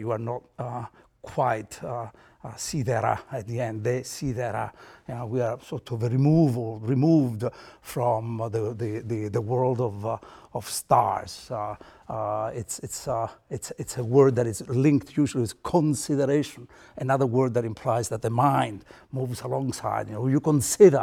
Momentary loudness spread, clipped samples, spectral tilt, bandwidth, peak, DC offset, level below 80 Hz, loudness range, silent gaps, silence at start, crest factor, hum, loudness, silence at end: 14 LU; under 0.1%; -6.5 dB/octave; 17 kHz; -4 dBFS; under 0.1%; -56 dBFS; 6 LU; none; 0 s; 22 dB; none; -26 LUFS; 0 s